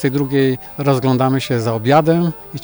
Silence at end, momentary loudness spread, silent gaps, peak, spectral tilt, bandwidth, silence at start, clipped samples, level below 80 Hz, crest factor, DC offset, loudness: 0 s; 6 LU; none; -2 dBFS; -7 dB/octave; over 20 kHz; 0 s; under 0.1%; -52 dBFS; 14 dB; under 0.1%; -16 LUFS